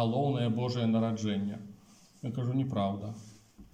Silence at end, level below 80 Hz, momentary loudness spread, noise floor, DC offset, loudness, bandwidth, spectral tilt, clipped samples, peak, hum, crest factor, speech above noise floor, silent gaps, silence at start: 0.1 s; -68 dBFS; 14 LU; -58 dBFS; under 0.1%; -32 LUFS; 9.2 kHz; -7.5 dB/octave; under 0.1%; -18 dBFS; none; 14 dB; 27 dB; none; 0 s